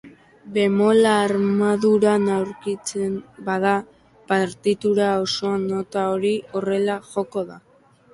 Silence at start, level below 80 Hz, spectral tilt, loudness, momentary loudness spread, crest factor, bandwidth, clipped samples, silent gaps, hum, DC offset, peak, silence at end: 0.05 s; -62 dBFS; -5.5 dB/octave; -21 LUFS; 10 LU; 16 dB; 11.5 kHz; under 0.1%; none; none; under 0.1%; -6 dBFS; 0.55 s